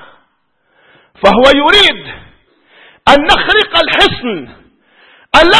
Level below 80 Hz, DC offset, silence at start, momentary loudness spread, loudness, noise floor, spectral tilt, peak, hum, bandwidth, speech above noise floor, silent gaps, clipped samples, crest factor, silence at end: -32 dBFS; under 0.1%; 1.25 s; 15 LU; -8 LUFS; -59 dBFS; -3.5 dB/octave; 0 dBFS; none; 11 kHz; 51 dB; none; 1%; 12 dB; 0 s